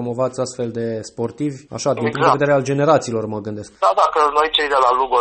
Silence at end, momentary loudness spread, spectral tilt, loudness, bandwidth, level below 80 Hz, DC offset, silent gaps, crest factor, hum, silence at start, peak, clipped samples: 0 s; 11 LU; -5 dB/octave; -18 LUFS; 8.8 kHz; -52 dBFS; under 0.1%; none; 18 dB; none; 0 s; 0 dBFS; under 0.1%